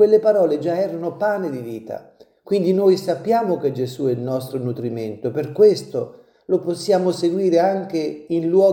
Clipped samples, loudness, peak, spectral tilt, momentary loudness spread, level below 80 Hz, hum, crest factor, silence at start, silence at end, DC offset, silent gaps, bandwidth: under 0.1%; -20 LUFS; -4 dBFS; -7 dB/octave; 12 LU; -68 dBFS; none; 16 dB; 0 s; 0 s; under 0.1%; none; 17 kHz